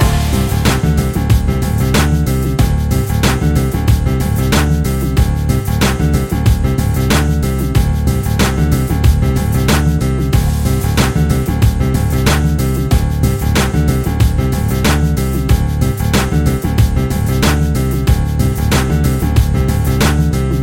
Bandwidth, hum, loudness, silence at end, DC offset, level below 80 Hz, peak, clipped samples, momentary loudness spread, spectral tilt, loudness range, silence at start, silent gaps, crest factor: 17 kHz; none; -14 LUFS; 0 s; under 0.1%; -18 dBFS; 0 dBFS; under 0.1%; 2 LU; -6 dB/octave; 1 LU; 0 s; none; 12 dB